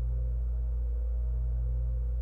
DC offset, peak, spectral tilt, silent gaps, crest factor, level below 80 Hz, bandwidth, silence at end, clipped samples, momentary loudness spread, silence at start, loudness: under 0.1%; -24 dBFS; -11 dB/octave; none; 6 dB; -30 dBFS; 1.5 kHz; 0 s; under 0.1%; 1 LU; 0 s; -34 LUFS